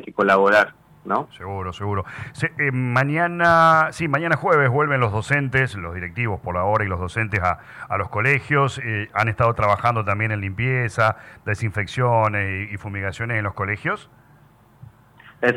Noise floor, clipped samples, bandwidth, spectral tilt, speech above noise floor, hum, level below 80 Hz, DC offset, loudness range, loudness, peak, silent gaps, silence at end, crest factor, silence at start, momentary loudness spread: -52 dBFS; under 0.1%; 12.5 kHz; -6.5 dB/octave; 31 dB; none; -50 dBFS; under 0.1%; 5 LU; -21 LUFS; -6 dBFS; none; 0 s; 14 dB; 0 s; 12 LU